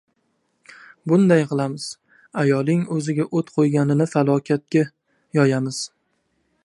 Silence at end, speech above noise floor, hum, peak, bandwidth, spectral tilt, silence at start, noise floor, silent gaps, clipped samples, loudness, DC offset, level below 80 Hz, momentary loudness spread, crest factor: 0.75 s; 50 dB; none; -4 dBFS; 11.5 kHz; -7 dB/octave; 1.05 s; -69 dBFS; none; under 0.1%; -20 LUFS; under 0.1%; -68 dBFS; 14 LU; 18 dB